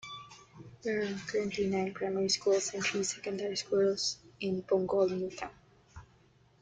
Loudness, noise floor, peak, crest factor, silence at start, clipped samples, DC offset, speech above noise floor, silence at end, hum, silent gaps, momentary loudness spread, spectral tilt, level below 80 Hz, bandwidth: -32 LUFS; -64 dBFS; -18 dBFS; 16 dB; 0.05 s; under 0.1%; under 0.1%; 33 dB; 0.6 s; none; none; 14 LU; -3.5 dB/octave; -66 dBFS; 9.4 kHz